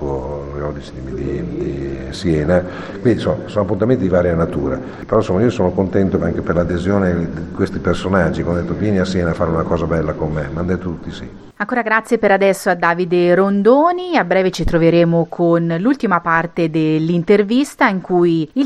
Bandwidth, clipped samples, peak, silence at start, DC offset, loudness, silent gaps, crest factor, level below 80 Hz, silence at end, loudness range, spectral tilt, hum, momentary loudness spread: 13 kHz; under 0.1%; 0 dBFS; 0 s; under 0.1%; -16 LUFS; none; 16 dB; -34 dBFS; 0 s; 5 LU; -7 dB/octave; none; 11 LU